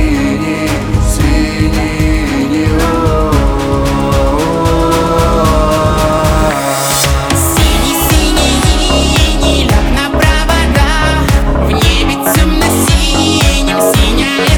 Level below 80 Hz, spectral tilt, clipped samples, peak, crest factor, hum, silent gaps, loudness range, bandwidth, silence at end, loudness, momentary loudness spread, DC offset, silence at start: -14 dBFS; -4.5 dB/octave; under 0.1%; 0 dBFS; 10 dB; none; none; 2 LU; over 20 kHz; 0 s; -11 LUFS; 3 LU; under 0.1%; 0 s